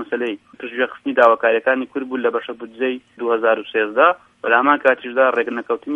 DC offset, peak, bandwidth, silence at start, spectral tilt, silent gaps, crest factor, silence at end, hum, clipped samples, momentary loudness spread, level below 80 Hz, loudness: under 0.1%; 0 dBFS; 4.8 kHz; 0 s; -5.5 dB/octave; none; 18 dB; 0 s; none; under 0.1%; 11 LU; -70 dBFS; -18 LUFS